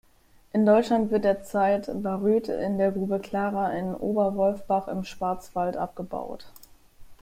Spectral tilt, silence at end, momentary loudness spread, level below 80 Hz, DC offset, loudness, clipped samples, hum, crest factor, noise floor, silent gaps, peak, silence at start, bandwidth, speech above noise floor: -7.5 dB/octave; 0.1 s; 11 LU; -54 dBFS; under 0.1%; -26 LUFS; under 0.1%; none; 18 dB; -58 dBFS; none; -10 dBFS; 0.55 s; 16 kHz; 33 dB